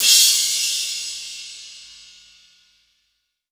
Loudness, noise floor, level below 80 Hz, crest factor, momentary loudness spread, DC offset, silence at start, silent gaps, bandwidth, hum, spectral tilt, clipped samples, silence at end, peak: -16 LUFS; -72 dBFS; -68 dBFS; 22 dB; 25 LU; under 0.1%; 0 s; none; over 20 kHz; none; 5 dB/octave; under 0.1%; 1.6 s; 0 dBFS